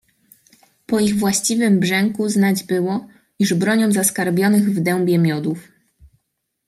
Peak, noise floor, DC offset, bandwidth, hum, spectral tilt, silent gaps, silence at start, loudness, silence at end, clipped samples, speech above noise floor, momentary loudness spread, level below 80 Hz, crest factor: -2 dBFS; -74 dBFS; under 0.1%; 15.5 kHz; none; -5 dB/octave; none; 0.9 s; -18 LUFS; 1.05 s; under 0.1%; 57 dB; 7 LU; -58 dBFS; 16 dB